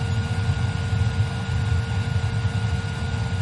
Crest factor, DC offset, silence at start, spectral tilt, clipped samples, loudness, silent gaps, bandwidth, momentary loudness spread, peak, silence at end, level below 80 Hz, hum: 12 dB; under 0.1%; 0 s; -6 dB/octave; under 0.1%; -25 LUFS; none; 11.5 kHz; 2 LU; -10 dBFS; 0 s; -36 dBFS; none